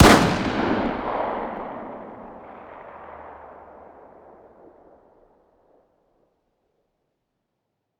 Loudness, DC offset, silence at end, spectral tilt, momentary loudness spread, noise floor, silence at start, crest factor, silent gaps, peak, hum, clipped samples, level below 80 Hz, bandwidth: -23 LUFS; under 0.1%; 4.45 s; -5 dB/octave; 23 LU; -78 dBFS; 0 s; 26 dB; none; 0 dBFS; none; under 0.1%; -40 dBFS; over 20 kHz